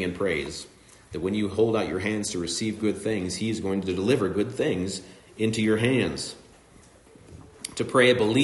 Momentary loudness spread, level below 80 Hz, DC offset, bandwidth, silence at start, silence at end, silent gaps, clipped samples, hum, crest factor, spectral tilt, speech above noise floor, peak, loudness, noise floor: 15 LU; -58 dBFS; under 0.1%; 11.5 kHz; 0 s; 0 s; none; under 0.1%; none; 20 dB; -5 dB/octave; 28 dB; -8 dBFS; -26 LUFS; -53 dBFS